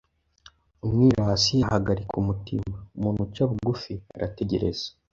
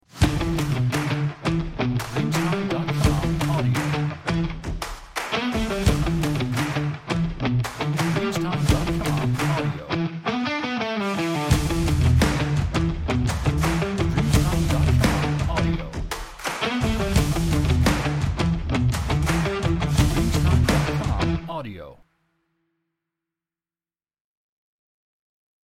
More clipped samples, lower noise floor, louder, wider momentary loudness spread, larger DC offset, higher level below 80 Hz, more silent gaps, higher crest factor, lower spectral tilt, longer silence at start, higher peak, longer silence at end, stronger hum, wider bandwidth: neither; second, -56 dBFS vs under -90 dBFS; about the same, -25 LUFS vs -23 LUFS; first, 13 LU vs 6 LU; neither; second, -44 dBFS vs -30 dBFS; neither; about the same, 20 dB vs 18 dB; about the same, -6 dB/octave vs -6 dB/octave; first, 0.85 s vs 0.15 s; about the same, -6 dBFS vs -6 dBFS; second, 0.25 s vs 3.7 s; neither; second, 7.8 kHz vs 16.5 kHz